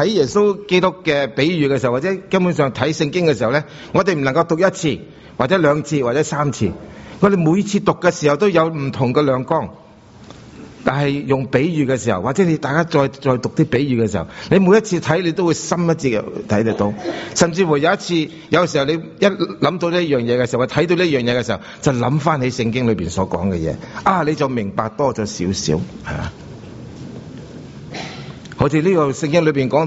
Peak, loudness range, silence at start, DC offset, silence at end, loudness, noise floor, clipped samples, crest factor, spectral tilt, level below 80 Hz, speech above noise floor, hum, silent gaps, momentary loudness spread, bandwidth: 0 dBFS; 4 LU; 0 s; under 0.1%; 0 s; -17 LUFS; -42 dBFS; under 0.1%; 18 dB; -5.5 dB/octave; -46 dBFS; 25 dB; none; none; 11 LU; 8 kHz